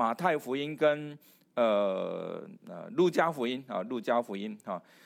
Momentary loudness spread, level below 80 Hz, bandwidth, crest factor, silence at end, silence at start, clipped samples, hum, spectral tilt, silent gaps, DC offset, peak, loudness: 13 LU; -88 dBFS; 16.5 kHz; 20 dB; 0.25 s; 0 s; under 0.1%; none; -6 dB/octave; none; under 0.1%; -12 dBFS; -31 LUFS